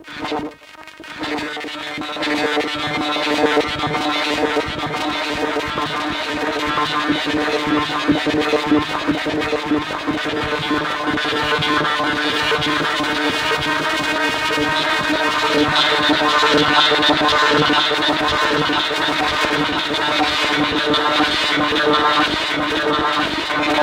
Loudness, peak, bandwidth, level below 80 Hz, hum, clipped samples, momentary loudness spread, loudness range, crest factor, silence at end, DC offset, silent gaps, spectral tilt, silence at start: -17 LUFS; -2 dBFS; 16.5 kHz; -46 dBFS; none; under 0.1%; 7 LU; 6 LU; 16 dB; 0 s; under 0.1%; none; -3.5 dB/octave; 0 s